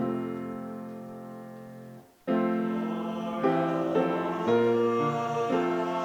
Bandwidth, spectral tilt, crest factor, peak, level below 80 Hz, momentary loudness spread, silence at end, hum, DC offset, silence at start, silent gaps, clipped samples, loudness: 19 kHz; -7.5 dB/octave; 16 dB; -12 dBFS; -76 dBFS; 18 LU; 0 s; none; under 0.1%; 0 s; none; under 0.1%; -28 LUFS